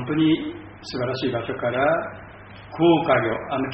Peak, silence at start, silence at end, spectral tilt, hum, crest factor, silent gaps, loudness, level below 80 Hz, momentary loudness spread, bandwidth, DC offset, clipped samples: -6 dBFS; 0 s; 0 s; -4.5 dB/octave; none; 18 dB; none; -22 LUFS; -52 dBFS; 19 LU; 5.4 kHz; under 0.1%; under 0.1%